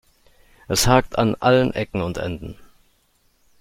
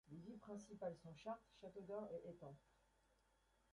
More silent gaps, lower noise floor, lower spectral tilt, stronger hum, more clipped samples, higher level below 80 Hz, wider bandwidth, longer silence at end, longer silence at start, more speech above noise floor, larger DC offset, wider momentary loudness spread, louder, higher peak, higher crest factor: neither; second, -62 dBFS vs -80 dBFS; second, -4.5 dB/octave vs -6.5 dB/octave; neither; neither; first, -40 dBFS vs -82 dBFS; first, 16.5 kHz vs 11 kHz; about the same, 1.05 s vs 0.95 s; first, 0.7 s vs 0.05 s; first, 43 dB vs 26 dB; neither; first, 13 LU vs 9 LU; first, -20 LUFS vs -55 LUFS; first, -2 dBFS vs -38 dBFS; about the same, 20 dB vs 20 dB